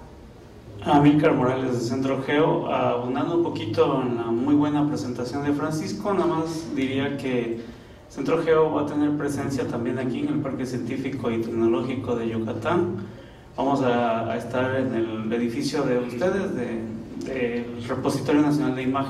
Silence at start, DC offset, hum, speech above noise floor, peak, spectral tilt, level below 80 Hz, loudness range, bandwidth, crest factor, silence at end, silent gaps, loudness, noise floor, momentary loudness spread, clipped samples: 0 s; under 0.1%; none; 21 dB; -8 dBFS; -7 dB/octave; -54 dBFS; 4 LU; 13 kHz; 16 dB; 0 s; none; -24 LUFS; -44 dBFS; 8 LU; under 0.1%